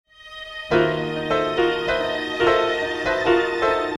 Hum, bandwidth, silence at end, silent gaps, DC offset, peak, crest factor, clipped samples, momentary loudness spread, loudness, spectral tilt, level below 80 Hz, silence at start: none; 11.5 kHz; 0 s; none; 0.2%; -4 dBFS; 18 dB; under 0.1%; 10 LU; -21 LUFS; -5 dB/octave; -46 dBFS; 0.2 s